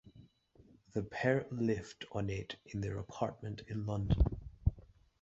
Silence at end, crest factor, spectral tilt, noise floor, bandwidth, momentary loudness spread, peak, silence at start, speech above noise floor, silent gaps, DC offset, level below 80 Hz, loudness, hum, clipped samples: 0.35 s; 22 dB; -6.5 dB/octave; -65 dBFS; 7.8 kHz; 9 LU; -16 dBFS; 0.05 s; 29 dB; none; under 0.1%; -44 dBFS; -38 LUFS; none; under 0.1%